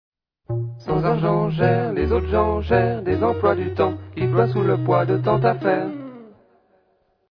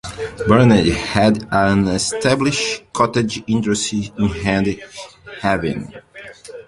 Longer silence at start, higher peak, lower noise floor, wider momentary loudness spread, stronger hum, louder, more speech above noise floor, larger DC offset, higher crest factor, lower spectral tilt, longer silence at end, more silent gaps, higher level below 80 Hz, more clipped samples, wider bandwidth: first, 0.5 s vs 0.05 s; second, -4 dBFS vs 0 dBFS; first, -64 dBFS vs -37 dBFS; second, 9 LU vs 21 LU; neither; second, -21 LUFS vs -17 LUFS; first, 45 dB vs 20 dB; neither; about the same, 18 dB vs 16 dB; first, -10 dB/octave vs -5 dB/octave; first, 1.05 s vs 0.05 s; neither; about the same, -38 dBFS vs -40 dBFS; neither; second, 5.4 kHz vs 11.5 kHz